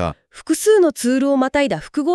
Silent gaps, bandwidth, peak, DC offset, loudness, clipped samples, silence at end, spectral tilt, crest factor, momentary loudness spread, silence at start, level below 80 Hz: none; 13.5 kHz; -4 dBFS; under 0.1%; -17 LUFS; under 0.1%; 0 s; -4.5 dB/octave; 14 dB; 10 LU; 0 s; -46 dBFS